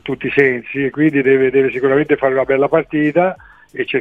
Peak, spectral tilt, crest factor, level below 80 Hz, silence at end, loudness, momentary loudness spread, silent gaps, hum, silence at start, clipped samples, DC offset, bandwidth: 0 dBFS; -8.5 dB/octave; 14 dB; -52 dBFS; 0 s; -15 LUFS; 8 LU; none; none; 0.05 s; under 0.1%; 0.1%; 3.9 kHz